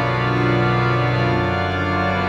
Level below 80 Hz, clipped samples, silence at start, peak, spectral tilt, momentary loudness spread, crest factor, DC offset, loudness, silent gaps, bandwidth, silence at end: -40 dBFS; under 0.1%; 0 s; -6 dBFS; -7.5 dB/octave; 3 LU; 12 dB; under 0.1%; -19 LUFS; none; 7.4 kHz; 0 s